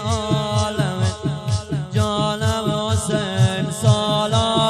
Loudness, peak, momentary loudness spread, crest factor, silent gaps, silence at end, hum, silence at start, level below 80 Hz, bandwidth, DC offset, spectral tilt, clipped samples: -20 LUFS; -4 dBFS; 5 LU; 16 dB; none; 0 s; none; 0 s; -40 dBFS; 13.5 kHz; under 0.1%; -5.5 dB/octave; under 0.1%